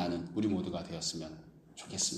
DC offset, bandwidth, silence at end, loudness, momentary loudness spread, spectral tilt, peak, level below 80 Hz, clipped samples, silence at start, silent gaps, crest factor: under 0.1%; 13.5 kHz; 0 s; -36 LUFS; 17 LU; -4 dB/octave; -20 dBFS; -64 dBFS; under 0.1%; 0 s; none; 16 dB